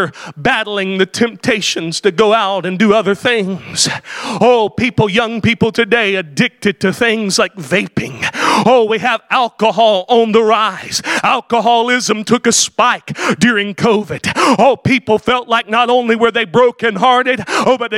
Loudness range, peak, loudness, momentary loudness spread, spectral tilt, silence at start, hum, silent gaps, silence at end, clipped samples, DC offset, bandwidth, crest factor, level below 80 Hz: 2 LU; 0 dBFS; -13 LUFS; 5 LU; -3.5 dB/octave; 0 s; none; none; 0 s; under 0.1%; under 0.1%; 16 kHz; 14 dB; -50 dBFS